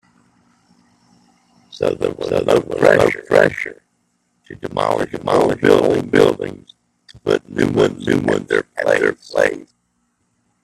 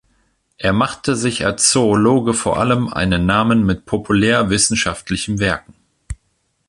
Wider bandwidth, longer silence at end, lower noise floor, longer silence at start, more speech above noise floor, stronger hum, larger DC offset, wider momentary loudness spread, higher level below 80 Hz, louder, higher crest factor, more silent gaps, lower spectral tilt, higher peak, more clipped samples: first, 13 kHz vs 11.5 kHz; first, 1 s vs 0.55 s; about the same, -66 dBFS vs -66 dBFS; first, 1.75 s vs 0.6 s; about the same, 50 dB vs 50 dB; neither; neither; first, 12 LU vs 9 LU; second, -50 dBFS vs -38 dBFS; about the same, -17 LUFS vs -16 LUFS; about the same, 18 dB vs 18 dB; neither; first, -5.5 dB/octave vs -4 dB/octave; about the same, 0 dBFS vs 0 dBFS; neither